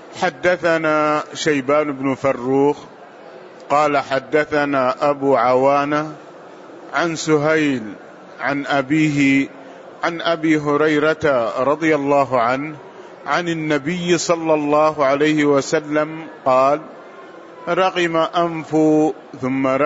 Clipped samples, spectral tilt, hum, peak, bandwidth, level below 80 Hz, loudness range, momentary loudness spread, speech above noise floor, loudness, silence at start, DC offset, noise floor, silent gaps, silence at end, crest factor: under 0.1%; -5 dB/octave; none; -4 dBFS; 8 kHz; -60 dBFS; 2 LU; 11 LU; 22 dB; -18 LUFS; 0 s; under 0.1%; -39 dBFS; none; 0 s; 14 dB